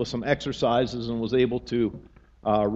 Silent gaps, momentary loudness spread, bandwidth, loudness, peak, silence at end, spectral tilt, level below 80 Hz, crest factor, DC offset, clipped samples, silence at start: none; 6 LU; 8 kHz; -26 LUFS; -8 dBFS; 0 s; -6.5 dB/octave; -50 dBFS; 18 dB; under 0.1%; under 0.1%; 0 s